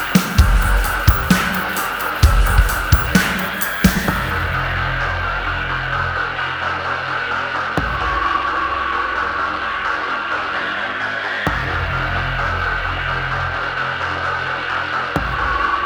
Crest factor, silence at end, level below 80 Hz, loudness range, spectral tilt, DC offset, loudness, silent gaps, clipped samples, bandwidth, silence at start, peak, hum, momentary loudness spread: 18 dB; 0 s; -24 dBFS; 4 LU; -4.5 dB/octave; under 0.1%; -19 LUFS; none; under 0.1%; over 20 kHz; 0 s; -2 dBFS; none; 5 LU